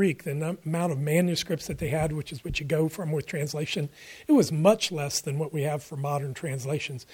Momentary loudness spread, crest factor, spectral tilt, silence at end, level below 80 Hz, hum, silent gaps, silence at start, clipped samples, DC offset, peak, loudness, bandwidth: 10 LU; 22 dB; -5.5 dB/octave; 0 s; -52 dBFS; none; none; 0 s; under 0.1%; under 0.1%; -6 dBFS; -28 LUFS; 17 kHz